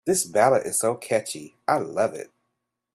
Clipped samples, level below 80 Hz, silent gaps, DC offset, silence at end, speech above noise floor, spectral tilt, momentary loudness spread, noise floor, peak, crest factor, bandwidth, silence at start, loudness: under 0.1%; -68 dBFS; none; under 0.1%; 0.7 s; 56 dB; -3.5 dB/octave; 14 LU; -79 dBFS; -4 dBFS; 20 dB; 14 kHz; 0.05 s; -23 LUFS